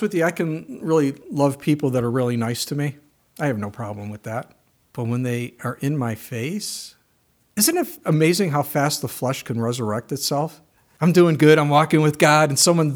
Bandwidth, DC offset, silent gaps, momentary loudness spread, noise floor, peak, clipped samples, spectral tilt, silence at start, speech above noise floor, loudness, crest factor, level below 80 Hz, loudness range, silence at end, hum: over 20 kHz; under 0.1%; none; 15 LU; -63 dBFS; 0 dBFS; under 0.1%; -5 dB/octave; 0 s; 43 dB; -20 LUFS; 20 dB; -64 dBFS; 9 LU; 0 s; none